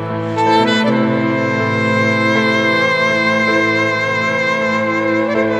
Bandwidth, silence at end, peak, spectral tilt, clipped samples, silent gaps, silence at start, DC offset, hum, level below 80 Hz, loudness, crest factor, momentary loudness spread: 11 kHz; 0 s; -2 dBFS; -5.5 dB/octave; under 0.1%; none; 0 s; under 0.1%; none; -54 dBFS; -14 LUFS; 14 dB; 3 LU